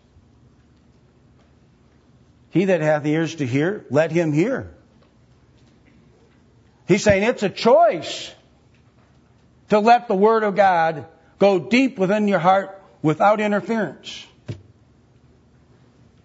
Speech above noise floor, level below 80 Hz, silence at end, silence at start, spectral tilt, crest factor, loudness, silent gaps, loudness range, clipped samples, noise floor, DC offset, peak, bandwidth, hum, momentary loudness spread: 37 dB; -54 dBFS; 1.7 s; 2.55 s; -6 dB/octave; 18 dB; -19 LUFS; none; 6 LU; under 0.1%; -55 dBFS; under 0.1%; -2 dBFS; 8 kHz; none; 19 LU